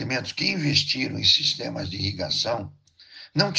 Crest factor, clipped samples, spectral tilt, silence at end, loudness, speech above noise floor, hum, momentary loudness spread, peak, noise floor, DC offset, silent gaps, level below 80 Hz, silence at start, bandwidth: 20 dB; under 0.1%; -3.5 dB/octave; 0 s; -23 LUFS; 23 dB; none; 12 LU; -6 dBFS; -48 dBFS; under 0.1%; none; -58 dBFS; 0 s; 10 kHz